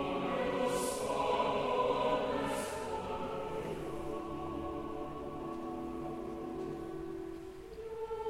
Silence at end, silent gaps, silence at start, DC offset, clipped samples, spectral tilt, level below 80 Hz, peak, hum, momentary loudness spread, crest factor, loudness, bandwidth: 0 s; none; 0 s; under 0.1%; under 0.1%; -5 dB/octave; -56 dBFS; -20 dBFS; none; 10 LU; 18 dB; -37 LUFS; 16 kHz